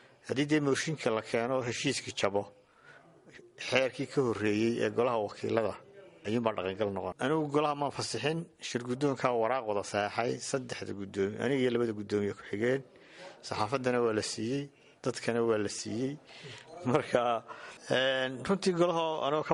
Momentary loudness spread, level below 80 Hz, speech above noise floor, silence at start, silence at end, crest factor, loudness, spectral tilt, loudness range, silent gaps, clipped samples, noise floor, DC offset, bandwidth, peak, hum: 9 LU; -70 dBFS; 26 dB; 0.25 s; 0 s; 20 dB; -32 LUFS; -5 dB/octave; 2 LU; none; under 0.1%; -58 dBFS; under 0.1%; 11.5 kHz; -12 dBFS; none